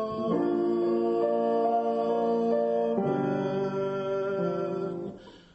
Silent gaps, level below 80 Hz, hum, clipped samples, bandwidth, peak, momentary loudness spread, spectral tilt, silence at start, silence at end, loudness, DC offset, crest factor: none; -66 dBFS; none; under 0.1%; 8 kHz; -14 dBFS; 5 LU; -8.5 dB/octave; 0 s; 0.2 s; -28 LUFS; under 0.1%; 12 dB